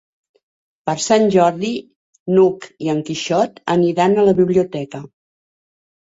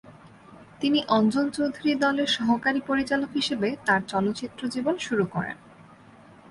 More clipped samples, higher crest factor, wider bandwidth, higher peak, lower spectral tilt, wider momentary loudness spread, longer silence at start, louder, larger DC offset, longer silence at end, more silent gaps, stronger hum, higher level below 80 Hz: neither; about the same, 16 dB vs 18 dB; second, 8 kHz vs 11.5 kHz; first, -2 dBFS vs -10 dBFS; about the same, -5.5 dB/octave vs -5 dB/octave; first, 14 LU vs 7 LU; first, 0.85 s vs 0.05 s; first, -17 LUFS vs -25 LUFS; neither; first, 1.05 s vs 0.7 s; first, 1.96-2.13 s, 2.19-2.26 s vs none; neither; about the same, -58 dBFS vs -62 dBFS